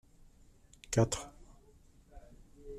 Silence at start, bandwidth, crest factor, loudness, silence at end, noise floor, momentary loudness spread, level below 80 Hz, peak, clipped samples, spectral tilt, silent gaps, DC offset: 0.9 s; 13.5 kHz; 22 dB; -33 LUFS; 0 s; -62 dBFS; 27 LU; -54 dBFS; -16 dBFS; under 0.1%; -5 dB/octave; none; under 0.1%